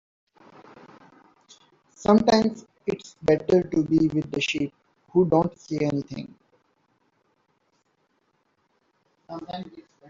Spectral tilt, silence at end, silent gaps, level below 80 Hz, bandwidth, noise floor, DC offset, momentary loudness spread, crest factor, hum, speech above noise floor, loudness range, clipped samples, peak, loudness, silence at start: -6.5 dB/octave; 0.3 s; none; -58 dBFS; 7.6 kHz; -70 dBFS; under 0.1%; 17 LU; 22 dB; none; 47 dB; 15 LU; under 0.1%; -4 dBFS; -24 LUFS; 2 s